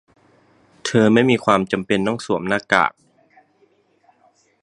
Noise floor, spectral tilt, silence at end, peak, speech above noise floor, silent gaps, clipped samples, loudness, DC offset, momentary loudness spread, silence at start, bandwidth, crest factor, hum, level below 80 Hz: -60 dBFS; -5.5 dB/octave; 1.75 s; 0 dBFS; 42 dB; none; under 0.1%; -18 LUFS; under 0.1%; 8 LU; 0.85 s; 11 kHz; 20 dB; none; -58 dBFS